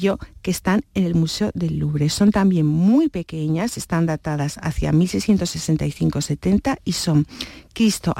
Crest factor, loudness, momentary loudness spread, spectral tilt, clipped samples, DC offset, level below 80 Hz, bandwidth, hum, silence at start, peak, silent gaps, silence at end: 12 dB; -20 LUFS; 8 LU; -6 dB/octave; under 0.1%; under 0.1%; -40 dBFS; 16.5 kHz; none; 0 s; -6 dBFS; none; 0 s